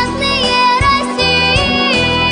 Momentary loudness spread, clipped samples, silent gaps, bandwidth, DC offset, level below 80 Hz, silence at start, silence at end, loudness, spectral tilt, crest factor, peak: 2 LU; under 0.1%; none; 10 kHz; under 0.1%; -28 dBFS; 0 s; 0 s; -11 LUFS; -4 dB/octave; 12 dB; -2 dBFS